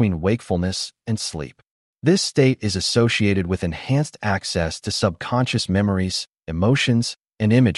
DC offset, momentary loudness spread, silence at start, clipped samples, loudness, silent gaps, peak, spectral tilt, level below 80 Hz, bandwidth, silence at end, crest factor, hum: under 0.1%; 9 LU; 0 s; under 0.1%; -21 LUFS; 1.71-1.94 s; -4 dBFS; -5.5 dB/octave; -44 dBFS; 11.5 kHz; 0 s; 16 dB; none